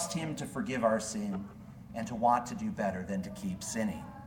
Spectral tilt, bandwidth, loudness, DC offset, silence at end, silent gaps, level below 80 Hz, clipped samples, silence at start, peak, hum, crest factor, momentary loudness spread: -5 dB/octave; 18 kHz; -34 LUFS; under 0.1%; 0 s; none; -60 dBFS; under 0.1%; 0 s; -14 dBFS; none; 20 dB; 12 LU